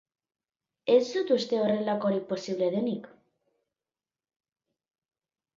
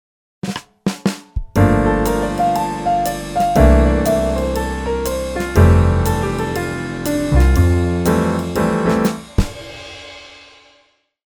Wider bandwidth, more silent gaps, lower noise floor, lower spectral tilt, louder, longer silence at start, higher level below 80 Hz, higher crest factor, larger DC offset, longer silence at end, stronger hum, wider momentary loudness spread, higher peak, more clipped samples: second, 7.6 kHz vs over 20 kHz; neither; first, under -90 dBFS vs -57 dBFS; about the same, -6 dB/octave vs -6.5 dB/octave; second, -28 LUFS vs -17 LUFS; first, 0.85 s vs 0.45 s; second, -78 dBFS vs -22 dBFS; about the same, 20 dB vs 16 dB; neither; first, 2.5 s vs 0.9 s; neither; second, 9 LU vs 14 LU; second, -10 dBFS vs 0 dBFS; neither